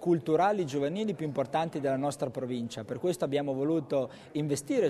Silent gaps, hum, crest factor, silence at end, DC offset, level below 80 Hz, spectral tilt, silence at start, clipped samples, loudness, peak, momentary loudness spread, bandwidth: none; none; 14 dB; 0 s; under 0.1%; -70 dBFS; -6 dB/octave; 0 s; under 0.1%; -31 LUFS; -16 dBFS; 8 LU; 13 kHz